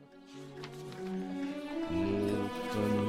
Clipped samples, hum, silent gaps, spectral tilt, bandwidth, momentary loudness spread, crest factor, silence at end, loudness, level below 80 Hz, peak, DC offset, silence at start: under 0.1%; none; none; -6.5 dB/octave; 16 kHz; 15 LU; 16 dB; 0 s; -36 LUFS; -58 dBFS; -20 dBFS; under 0.1%; 0 s